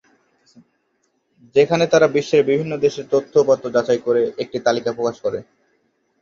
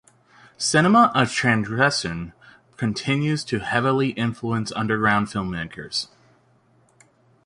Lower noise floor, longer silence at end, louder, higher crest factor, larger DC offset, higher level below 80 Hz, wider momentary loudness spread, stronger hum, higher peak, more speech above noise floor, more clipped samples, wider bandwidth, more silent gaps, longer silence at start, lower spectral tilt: first, -68 dBFS vs -59 dBFS; second, 0.8 s vs 1.4 s; first, -18 LUFS vs -21 LUFS; about the same, 18 dB vs 20 dB; neither; second, -62 dBFS vs -52 dBFS; second, 8 LU vs 13 LU; neither; about the same, -2 dBFS vs -4 dBFS; first, 50 dB vs 38 dB; neither; second, 7.4 kHz vs 11.5 kHz; neither; first, 1.55 s vs 0.6 s; about the same, -5.5 dB/octave vs -4.5 dB/octave